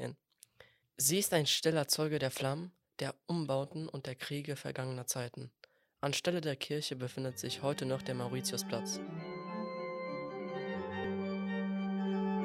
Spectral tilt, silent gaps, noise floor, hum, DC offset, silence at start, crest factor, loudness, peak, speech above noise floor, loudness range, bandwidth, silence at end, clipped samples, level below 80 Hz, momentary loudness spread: -4 dB/octave; none; -65 dBFS; none; under 0.1%; 0 s; 20 dB; -36 LUFS; -16 dBFS; 29 dB; 6 LU; 16 kHz; 0 s; under 0.1%; -76 dBFS; 12 LU